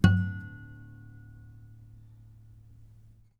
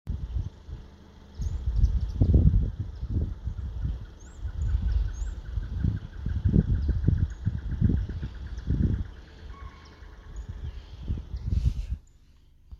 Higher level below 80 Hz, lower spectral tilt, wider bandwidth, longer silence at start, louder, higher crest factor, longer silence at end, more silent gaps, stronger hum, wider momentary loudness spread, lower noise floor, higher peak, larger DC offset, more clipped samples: second, -48 dBFS vs -30 dBFS; second, -7.5 dB/octave vs -9 dB/octave; first, 9 kHz vs 7.4 kHz; about the same, 0.05 s vs 0.05 s; about the same, -31 LUFS vs -30 LUFS; about the same, 26 dB vs 22 dB; first, 2.55 s vs 0 s; neither; neither; first, 23 LU vs 20 LU; about the same, -56 dBFS vs -56 dBFS; about the same, -6 dBFS vs -6 dBFS; neither; neither